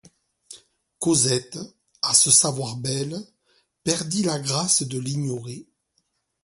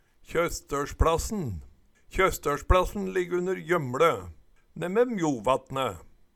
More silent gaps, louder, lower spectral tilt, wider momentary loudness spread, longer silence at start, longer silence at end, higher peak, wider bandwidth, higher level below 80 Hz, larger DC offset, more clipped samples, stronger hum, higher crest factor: neither; first, -21 LUFS vs -27 LUFS; second, -3 dB/octave vs -5.5 dB/octave; first, 21 LU vs 11 LU; first, 0.5 s vs 0.3 s; first, 0.8 s vs 0.3 s; first, -2 dBFS vs -8 dBFS; second, 12 kHz vs 18.5 kHz; second, -62 dBFS vs -38 dBFS; neither; neither; neither; about the same, 24 dB vs 20 dB